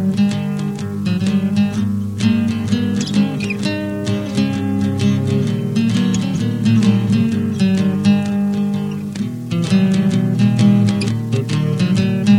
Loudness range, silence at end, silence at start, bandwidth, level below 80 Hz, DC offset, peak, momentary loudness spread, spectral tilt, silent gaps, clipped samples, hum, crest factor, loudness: 2 LU; 0 s; 0 s; 11.5 kHz; -50 dBFS; under 0.1%; -2 dBFS; 7 LU; -7 dB/octave; none; under 0.1%; none; 14 dB; -17 LUFS